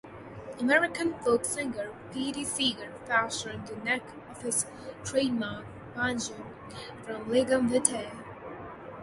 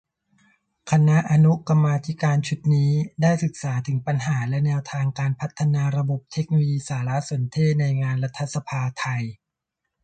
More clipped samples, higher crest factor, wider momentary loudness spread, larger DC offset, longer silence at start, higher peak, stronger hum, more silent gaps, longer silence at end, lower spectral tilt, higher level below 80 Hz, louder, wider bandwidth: neither; first, 26 dB vs 16 dB; first, 18 LU vs 9 LU; neither; second, 0.05 s vs 0.85 s; about the same, -6 dBFS vs -6 dBFS; neither; neither; second, 0 s vs 0.7 s; second, -3 dB/octave vs -7 dB/octave; about the same, -60 dBFS vs -58 dBFS; second, -30 LUFS vs -22 LUFS; first, 12 kHz vs 9 kHz